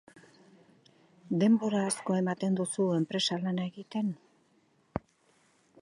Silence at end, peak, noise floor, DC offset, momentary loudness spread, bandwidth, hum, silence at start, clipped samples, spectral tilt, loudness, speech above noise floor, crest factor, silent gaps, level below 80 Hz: 0.85 s; -14 dBFS; -68 dBFS; under 0.1%; 15 LU; 11.5 kHz; none; 1.25 s; under 0.1%; -5.5 dB/octave; -31 LUFS; 39 dB; 18 dB; none; -66 dBFS